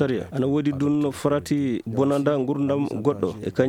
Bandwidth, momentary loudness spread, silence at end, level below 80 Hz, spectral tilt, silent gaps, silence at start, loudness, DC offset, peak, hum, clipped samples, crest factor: 15.5 kHz; 3 LU; 0 s; -56 dBFS; -7.5 dB/octave; none; 0 s; -23 LUFS; under 0.1%; -6 dBFS; none; under 0.1%; 18 dB